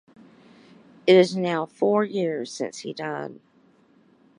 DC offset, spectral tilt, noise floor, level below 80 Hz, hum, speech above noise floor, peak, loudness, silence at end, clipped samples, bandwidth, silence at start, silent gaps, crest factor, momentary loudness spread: under 0.1%; -5.5 dB/octave; -59 dBFS; -76 dBFS; none; 36 dB; -4 dBFS; -23 LUFS; 1.05 s; under 0.1%; 10.5 kHz; 1.05 s; none; 20 dB; 15 LU